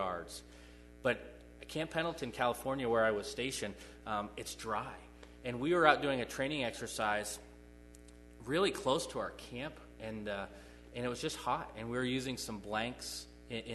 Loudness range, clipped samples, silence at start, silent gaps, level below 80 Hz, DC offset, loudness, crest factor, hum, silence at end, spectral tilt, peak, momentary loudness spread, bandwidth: 5 LU; under 0.1%; 0 s; none; -58 dBFS; under 0.1%; -37 LUFS; 28 dB; 60 Hz at -60 dBFS; 0 s; -4 dB/octave; -10 dBFS; 19 LU; 12.5 kHz